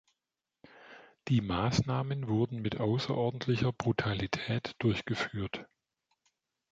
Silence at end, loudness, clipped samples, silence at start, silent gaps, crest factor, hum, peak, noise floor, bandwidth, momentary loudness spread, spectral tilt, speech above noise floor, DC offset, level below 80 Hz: 1.1 s; -32 LUFS; under 0.1%; 0.75 s; none; 20 dB; none; -12 dBFS; -89 dBFS; 7.8 kHz; 9 LU; -6.5 dB/octave; 58 dB; under 0.1%; -56 dBFS